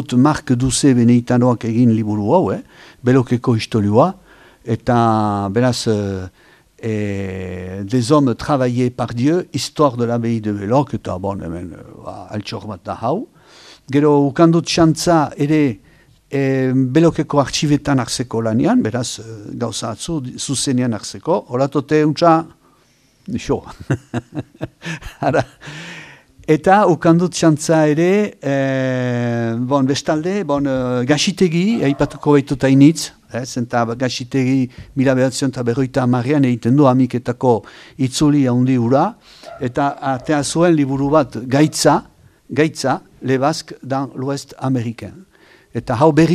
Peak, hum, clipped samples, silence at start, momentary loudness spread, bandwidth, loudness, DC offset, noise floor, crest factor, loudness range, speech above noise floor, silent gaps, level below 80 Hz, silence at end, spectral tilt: 0 dBFS; none; under 0.1%; 0 s; 14 LU; 13.5 kHz; -17 LUFS; under 0.1%; -55 dBFS; 16 dB; 5 LU; 39 dB; none; -46 dBFS; 0 s; -6 dB/octave